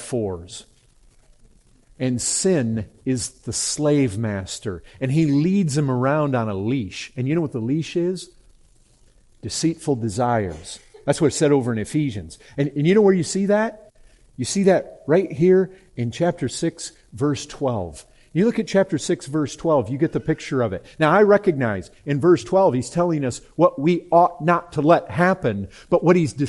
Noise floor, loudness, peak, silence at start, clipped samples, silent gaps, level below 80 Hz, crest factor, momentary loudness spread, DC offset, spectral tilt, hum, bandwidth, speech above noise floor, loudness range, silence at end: -54 dBFS; -21 LUFS; -4 dBFS; 0 s; under 0.1%; none; -52 dBFS; 18 dB; 12 LU; under 0.1%; -5.5 dB/octave; none; 11.5 kHz; 34 dB; 6 LU; 0 s